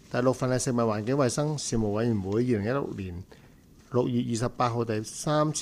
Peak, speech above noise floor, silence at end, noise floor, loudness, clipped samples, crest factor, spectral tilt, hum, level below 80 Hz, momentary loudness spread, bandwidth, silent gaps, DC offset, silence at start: -12 dBFS; 26 dB; 0 s; -53 dBFS; -28 LUFS; under 0.1%; 16 dB; -5.5 dB/octave; none; -50 dBFS; 5 LU; 15 kHz; none; under 0.1%; 0.1 s